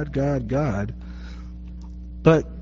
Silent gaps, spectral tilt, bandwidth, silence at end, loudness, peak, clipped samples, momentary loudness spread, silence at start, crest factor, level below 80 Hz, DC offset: none; -7.5 dB/octave; 7.2 kHz; 0 s; -22 LUFS; -4 dBFS; under 0.1%; 20 LU; 0 s; 20 dB; -36 dBFS; under 0.1%